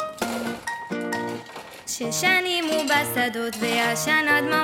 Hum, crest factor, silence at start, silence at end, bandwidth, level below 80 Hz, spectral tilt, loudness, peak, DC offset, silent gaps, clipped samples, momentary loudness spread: none; 18 dB; 0 s; 0 s; 17 kHz; -62 dBFS; -2.5 dB/octave; -23 LUFS; -6 dBFS; under 0.1%; none; under 0.1%; 12 LU